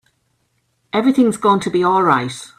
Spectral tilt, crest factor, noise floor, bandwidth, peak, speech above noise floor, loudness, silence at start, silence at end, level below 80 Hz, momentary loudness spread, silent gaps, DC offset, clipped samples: -5.5 dB/octave; 16 dB; -66 dBFS; 13.5 kHz; 0 dBFS; 50 dB; -16 LUFS; 0.95 s; 0.15 s; -60 dBFS; 4 LU; none; under 0.1%; under 0.1%